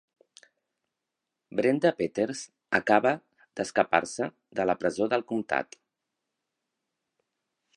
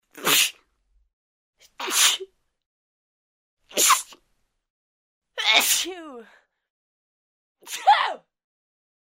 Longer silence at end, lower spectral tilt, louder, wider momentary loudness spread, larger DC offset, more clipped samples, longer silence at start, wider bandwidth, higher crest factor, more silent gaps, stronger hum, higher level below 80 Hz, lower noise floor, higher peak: first, 2.1 s vs 0.95 s; first, -5 dB/octave vs 1.5 dB/octave; second, -28 LUFS vs -20 LUFS; second, 11 LU vs 19 LU; neither; neither; first, 1.55 s vs 0.15 s; second, 11.5 kHz vs 16.5 kHz; about the same, 26 dB vs 24 dB; second, none vs 1.13-1.53 s, 2.66-3.57 s, 4.70-5.22 s, 6.70-7.55 s; neither; about the same, -70 dBFS vs -74 dBFS; first, -86 dBFS vs -71 dBFS; about the same, -4 dBFS vs -2 dBFS